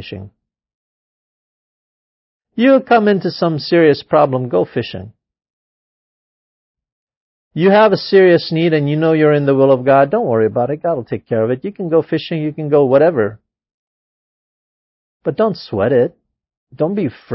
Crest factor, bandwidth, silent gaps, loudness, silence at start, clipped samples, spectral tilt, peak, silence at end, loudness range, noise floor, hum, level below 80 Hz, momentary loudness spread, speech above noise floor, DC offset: 16 dB; 5.8 kHz; 0.74-2.40 s, 5.50-6.75 s, 6.92-7.07 s, 7.17-7.51 s, 13.74-15.20 s, 16.57-16.67 s; -14 LUFS; 0 s; under 0.1%; -10.5 dB/octave; 0 dBFS; 0 s; 8 LU; under -90 dBFS; none; -54 dBFS; 11 LU; over 76 dB; under 0.1%